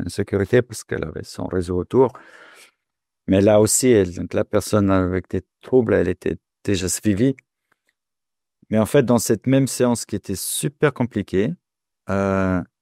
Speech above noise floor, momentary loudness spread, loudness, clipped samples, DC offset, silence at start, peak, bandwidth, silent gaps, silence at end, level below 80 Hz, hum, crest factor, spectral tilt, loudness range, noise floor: 68 dB; 12 LU; -20 LUFS; under 0.1%; under 0.1%; 0 s; -4 dBFS; 16 kHz; none; 0.15 s; -50 dBFS; none; 18 dB; -5.5 dB/octave; 4 LU; -88 dBFS